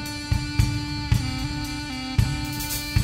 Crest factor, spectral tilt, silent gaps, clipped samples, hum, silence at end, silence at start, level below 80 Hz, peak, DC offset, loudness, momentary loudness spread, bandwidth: 18 dB; -4.5 dB/octave; none; under 0.1%; none; 0 s; 0 s; -32 dBFS; -6 dBFS; under 0.1%; -26 LUFS; 5 LU; 16.5 kHz